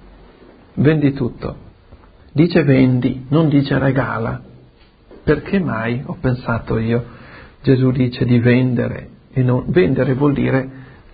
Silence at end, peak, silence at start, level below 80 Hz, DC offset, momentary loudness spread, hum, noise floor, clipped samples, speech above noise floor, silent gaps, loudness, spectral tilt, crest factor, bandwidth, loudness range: 0.3 s; -2 dBFS; 0.75 s; -40 dBFS; under 0.1%; 12 LU; none; -48 dBFS; under 0.1%; 32 dB; none; -17 LUFS; -13 dB/octave; 16 dB; 5 kHz; 4 LU